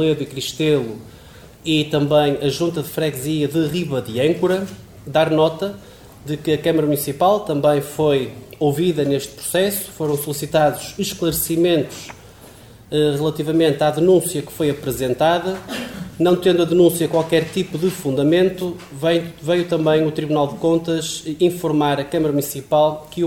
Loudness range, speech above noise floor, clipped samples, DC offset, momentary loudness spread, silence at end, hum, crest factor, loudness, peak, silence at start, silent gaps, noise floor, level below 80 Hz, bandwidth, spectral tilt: 3 LU; 24 dB; under 0.1%; 0.1%; 9 LU; 0 s; none; 16 dB; -19 LUFS; -4 dBFS; 0 s; none; -42 dBFS; -50 dBFS; 18 kHz; -5.5 dB/octave